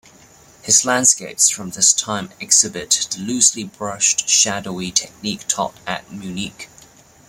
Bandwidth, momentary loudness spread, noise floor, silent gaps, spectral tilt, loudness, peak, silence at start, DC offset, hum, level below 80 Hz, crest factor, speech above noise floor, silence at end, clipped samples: 16.5 kHz; 14 LU; -47 dBFS; none; -1 dB/octave; -16 LUFS; 0 dBFS; 0.65 s; under 0.1%; none; -58 dBFS; 20 dB; 28 dB; 0.6 s; under 0.1%